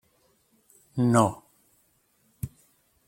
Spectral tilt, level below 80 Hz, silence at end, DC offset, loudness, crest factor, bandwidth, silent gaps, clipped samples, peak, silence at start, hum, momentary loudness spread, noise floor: -6.5 dB/octave; -58 dBFS; 0.6 s; under 0.1%; -24 LUFS; 26 dB; 16.5 kHz; none; under 0.1%; -4 dBFS; 0.95 s; none; 18 LU; -67 dBFS